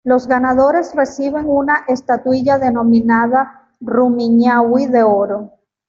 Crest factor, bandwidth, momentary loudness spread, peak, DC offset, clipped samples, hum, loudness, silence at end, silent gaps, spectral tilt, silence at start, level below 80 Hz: 12 dB; 7.2 kHz; 7 LU; -2 dBFS; under 0.1%; under 0.1%; none; -14 LUFS; 0.4 s; none; -7 dB/octave; 0.05 s; -50 dBFS